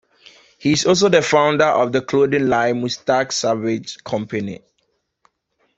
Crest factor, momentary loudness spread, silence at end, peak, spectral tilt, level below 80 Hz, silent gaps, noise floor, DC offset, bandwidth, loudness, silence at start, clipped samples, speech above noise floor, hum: 18 dB; 12 LU; 1.2 s; -2 dBFS; -4.5 dB/octave; -56 dBFS; none; -69 dBFS; under 0.1%; 8.2 kHz; -18 LUFS; 0.6 s; under 0.1%; 51 dB; none